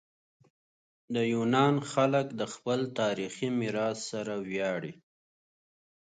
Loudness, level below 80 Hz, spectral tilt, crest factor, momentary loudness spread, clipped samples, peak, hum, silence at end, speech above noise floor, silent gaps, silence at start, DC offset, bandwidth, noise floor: -30 LUFS; -74 dBFS; -5.5 dB/octave; 20 dB; 10 LU; under 0.1%; -12 dBFS; none; 1.1 s; over 60 dB; none; 1.1 s; under 0.1%; 9.4 kHz; under -90 dBFS